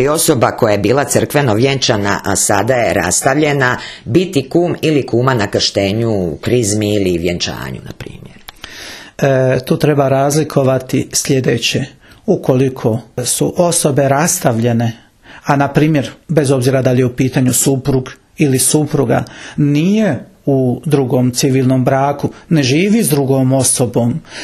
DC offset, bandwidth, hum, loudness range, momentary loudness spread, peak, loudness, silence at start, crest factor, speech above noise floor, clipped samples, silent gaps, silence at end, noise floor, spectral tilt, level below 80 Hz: under 0.1%; 14 kHz; none; 3 LU; 7 LU; 0 dBFS; -13 LUFS; 0 s; 14 dB; 22 dB; under 0.1%; none; 0 s; -35 dBFS; -5 dB/octave; -44 dBFS